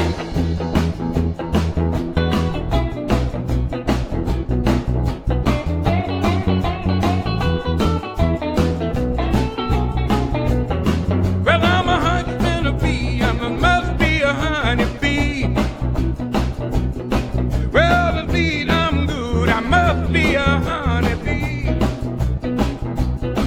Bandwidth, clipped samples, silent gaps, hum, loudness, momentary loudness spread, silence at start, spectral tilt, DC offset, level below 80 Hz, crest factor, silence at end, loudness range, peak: 15.5 kHz; under 0.1%; none; none; -19 LUFS; 6 LU; 0 s; -6.5 dB/octave; under 0.1%; -24 dBFS; 18 dB; 0 s; 3 LU; 0 dBFS